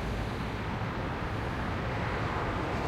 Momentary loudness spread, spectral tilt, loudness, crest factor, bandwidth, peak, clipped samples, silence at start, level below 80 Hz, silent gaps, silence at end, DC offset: 3 LU; -6.5 dB/octave; -33 LUFS; 12 dB; 15.5 kHz; -20 dBFS; under 0.1%; 0 s; -42 dBFS; none; 0 s; under 0.1%